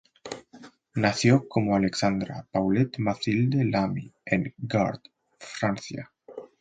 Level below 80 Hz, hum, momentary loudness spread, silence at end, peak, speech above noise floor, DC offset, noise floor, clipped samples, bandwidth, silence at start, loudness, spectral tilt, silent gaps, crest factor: -56 dBFS; none; 18 LU; 0.15 s; -6 dBFS; 26 dB; under 0.1%; -51 dBFS; under 0.1%; 9.4 kHz; 0.25 s; -26 LUFS; -6 dB/octave; none; 20 dB